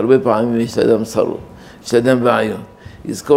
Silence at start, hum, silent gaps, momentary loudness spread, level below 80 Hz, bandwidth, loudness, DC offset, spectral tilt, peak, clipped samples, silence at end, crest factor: 0 s; none; none; 16 LU; -50 dBFS; 16 kHz; -16 LUFS; under 0.1%; -6 dB/octave; 0 dBFS; under 0.1%; 0 s; 16 dB